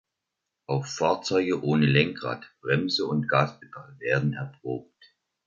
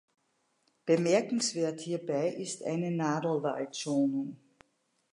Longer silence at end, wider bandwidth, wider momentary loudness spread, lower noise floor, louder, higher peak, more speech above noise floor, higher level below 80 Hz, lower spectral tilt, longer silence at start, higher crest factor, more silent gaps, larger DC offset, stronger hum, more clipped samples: about the same, 0.65 s vs 0.75 s; second, 7.6 kHz vs 11.5 kHz; first, 13 LU vs 9 LU; first, -84 dBFS vs -75 dBFS; first, -26 LUFS vs -31 LUFS; first, -6 dBFS vs -14 dBFS; first, 58 dB vs 45 dB; first, -62 dBFS vs -82 dBFS; about the same, -6 dB/octave vs -5 dB/octave; second, 0.7 s vs 0.85 s; about the same, 22 dB vs 18 dB; neither; neither; neither; neither